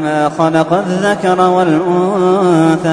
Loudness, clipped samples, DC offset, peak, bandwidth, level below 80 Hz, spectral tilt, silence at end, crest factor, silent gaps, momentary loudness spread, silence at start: -12 LUFS; under 0.1%; under 0.1%; 0 dBFS; 10.5 kHz; -52 dBFS; -6.5 dB/octave; 0 s; 12 dB; none; 3 LU; 0 s